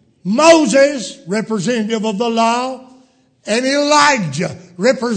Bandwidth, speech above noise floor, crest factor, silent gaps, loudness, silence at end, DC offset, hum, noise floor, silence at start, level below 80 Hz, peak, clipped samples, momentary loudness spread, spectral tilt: 11 kHz; 37 dB; 16 dB; none; -14 LUFS; 0 s; under 0.1%; none; -51 dBFS; 0.25 s; -60 dBFS; 0 dBFS; under 0.1%; 14 LU; -4 dB/octave